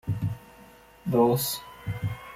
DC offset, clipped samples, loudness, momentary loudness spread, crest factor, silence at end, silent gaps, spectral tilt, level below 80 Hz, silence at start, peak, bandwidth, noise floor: under 0.1%; under 0.1%; -28 LUFS; 15 LU; 18 dB; 0 s; none; -6 dB/octave; -52 dBFS; 0.05 s; -10 dBFS; 16.5 kHz; -52 dBFS